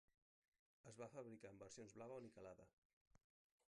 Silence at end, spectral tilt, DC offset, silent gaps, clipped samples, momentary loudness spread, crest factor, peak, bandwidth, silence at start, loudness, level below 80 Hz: 0.5 s; -5 dB/octave; under 0.1%; 2.73-3.11 s; under 0.1%; 6 LU; 18 dB; -44 dBFS; 10.5 kHz; 0.85 s; -60 LUFS; -88 dBFS